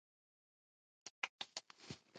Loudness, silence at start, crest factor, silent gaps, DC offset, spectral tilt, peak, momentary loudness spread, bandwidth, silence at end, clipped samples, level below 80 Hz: -49 LUFS; 1.05 s; 32 dB; 1.10-1.22 s, 1.29-1.39 s; under 0.1%; -1.5 dB/octave; -22 dBFS; 13 LU; 9 kHz; 0 s; under 0.1%; -84 dBFS